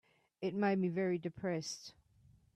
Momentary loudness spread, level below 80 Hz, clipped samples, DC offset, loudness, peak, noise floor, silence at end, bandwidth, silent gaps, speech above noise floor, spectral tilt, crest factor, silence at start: 12 LU; -76 dBFS; under 0.1%; under 0.1%; -37 LUFS; -24 dBFS; -67 dBFS; 0.65 s; 12 kHz; none; 31 dB; -6 dB/octave; 16 dB; 0.4 s